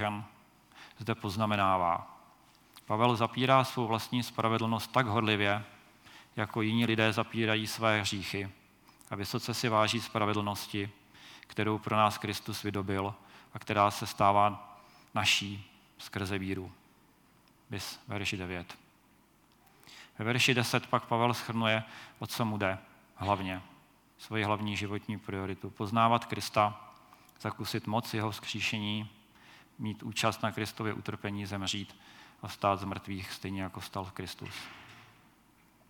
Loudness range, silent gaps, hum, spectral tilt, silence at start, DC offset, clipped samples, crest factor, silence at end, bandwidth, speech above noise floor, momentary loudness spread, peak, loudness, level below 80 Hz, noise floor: 7 LU; none; none; -4.5 dB/octave; 0 s; under 0.1%; under 0.1%; 24 dB; 0.85 s; 19 kHz; 33 dB; 16 LU; -10 dBFS; -32 LUFS; -72 dBFS; -65 dBFS